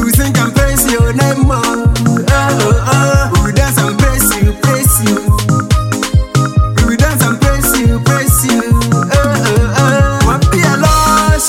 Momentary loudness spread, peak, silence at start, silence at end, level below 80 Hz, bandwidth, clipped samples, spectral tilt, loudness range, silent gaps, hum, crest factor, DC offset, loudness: 3 LU; 0 dBFS; 0 s; 0 s; -18 dBFS; 17 kHz; under 0.1%; -5 dB/octave; 1 LU; none; none; 10 dB; under 0.1%; -11 LUFS